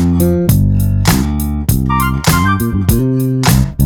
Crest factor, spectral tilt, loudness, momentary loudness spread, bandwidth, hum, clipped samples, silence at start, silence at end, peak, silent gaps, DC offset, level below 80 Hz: 12 dB; -5.5 dB/octave; -13 LUFS; 3 LU; over 20 kHz; none; under 0.1%; 0 s; 0 s; 0 dBFS; none; under 0.1%; -20 dBFS